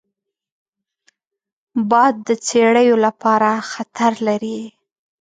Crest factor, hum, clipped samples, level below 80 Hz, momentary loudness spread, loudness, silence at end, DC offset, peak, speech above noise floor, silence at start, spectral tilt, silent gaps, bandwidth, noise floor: 16 dB; none; under 0.1%; -70 dBFS; 14 LU; -16 LUFS; 0.5 s; under 0.1%; -2 dBFS; 68 dB; 1.75 s; -4.5 dB/octave; none; 9.4 kHz; -84 dBFS